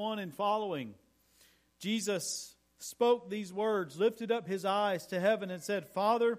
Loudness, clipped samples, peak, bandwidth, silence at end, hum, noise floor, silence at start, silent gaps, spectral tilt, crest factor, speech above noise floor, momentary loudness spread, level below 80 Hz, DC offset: -33 LUFS; under 0.1%; -16 dBFS; 15.5 kHz; 0 s; none; -66 dBFS; 0 s; none; -4 dB/octave; 18 dB; 34 dB; 11 LU; -78 dBFS; under 0.1%